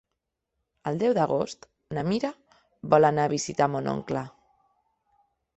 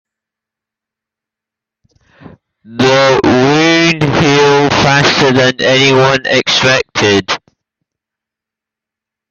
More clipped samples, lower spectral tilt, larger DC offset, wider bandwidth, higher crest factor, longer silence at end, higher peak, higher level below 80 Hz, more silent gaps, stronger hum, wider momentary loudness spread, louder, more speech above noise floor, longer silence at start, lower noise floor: neither; first, -6 dB/octave vs -4.5 dB/octave; neither; about the same, 8.4 kHz vs 8 kHz; first, 24 dB vs 12 dB; second, 1.3 s vs 1.95 s; second, -4 dBFS vs 0 dBFS; second, -64 dBFS vs -44 dBFS; neither; neither; first, 15 LU vs 3 LU; second, -26 LUFS vs -9 LUFS; second, 58 dB vs 74 dB; second, 0.85 s vs 2.7 s; about the same, -83 dBFS vs -84 dBFS